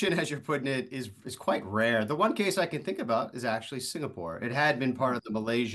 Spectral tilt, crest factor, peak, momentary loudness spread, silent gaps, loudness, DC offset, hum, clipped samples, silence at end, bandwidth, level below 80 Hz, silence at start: -5 dB/octave; 18 dB; -12 dBFS; 9 LU; none; -30 LUFS; under 0.1%; none; under 0.1%; 0 s; 12.5 kHz; -68 dBFS; 0 s